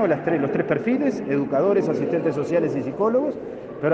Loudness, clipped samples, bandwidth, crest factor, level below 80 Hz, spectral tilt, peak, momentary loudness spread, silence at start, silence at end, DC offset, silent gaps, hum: -22 LUFS; under 0.1%; 8 kHz; 16 dB; -62 dBFS; -8.5 dB/octave; -6 dBFS; 6 LU; 0 s; 0 s; under 0.1%; none; none